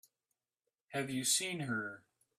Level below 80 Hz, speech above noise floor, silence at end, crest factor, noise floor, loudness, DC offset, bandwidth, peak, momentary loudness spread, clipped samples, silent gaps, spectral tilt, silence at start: -80 dBFS; over 53 dB; 0.4 s; 22 dB; under -90 dBFS; -36 LUFS; under 0.1%; 15.5 kHz; -18 dBFS; 13 LU; under 0.1%; none; -2.5 dB/octave; 0.9 s